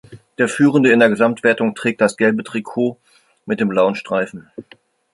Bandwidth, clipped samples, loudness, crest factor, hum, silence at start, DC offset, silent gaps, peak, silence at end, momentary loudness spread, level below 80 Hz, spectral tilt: 11.5 kHz; under 0.1%; -17 LUFS; 16 dB; none; 0.1 s; under 0.1%; none; -2 dBFS; 0.5 s; 11 LU; -62 dBFS; -6 dB/octave